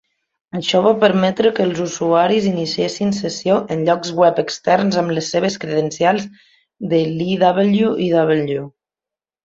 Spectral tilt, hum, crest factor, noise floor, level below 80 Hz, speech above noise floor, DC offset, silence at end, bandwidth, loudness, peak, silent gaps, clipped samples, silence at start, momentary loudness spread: -5.5 dB/octave; none; 16 dB; -89 dBFS; -58 dBFS; 72 dB; under 0.1%; 0.75 s; 7.8 kHz; -17 LUFS; -2 dBFS; none; under 0.1%; 0.55 s; 7 LU